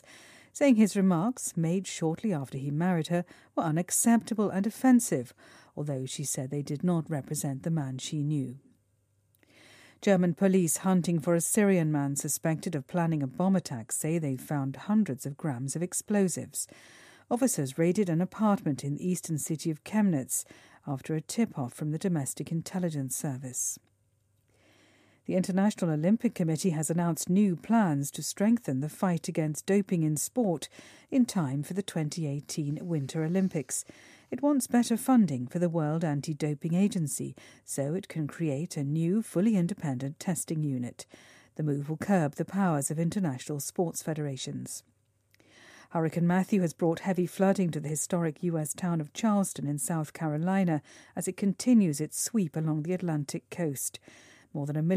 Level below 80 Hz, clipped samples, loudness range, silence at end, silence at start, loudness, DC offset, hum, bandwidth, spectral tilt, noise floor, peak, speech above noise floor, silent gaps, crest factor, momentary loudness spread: -74 dBFS; under 0.1%; 5 LU; 0 s; 0.15 s; -29 LUFS; under 0.1%; none; 15.5 kHz; -6 dB/octave; -71 dBFS; -12 dBFS; 42 dB; none; 18 dB; 9 LU